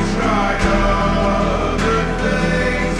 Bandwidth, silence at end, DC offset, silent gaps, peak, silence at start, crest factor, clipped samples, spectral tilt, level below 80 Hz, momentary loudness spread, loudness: 11.5 kHz; 0 s; under 0.1%; none; -4 dBFS; 0 s; 12 dB; under 0.1%; -5.5 dB/octave; -24 dBFS; 2 LU; -17 LUFS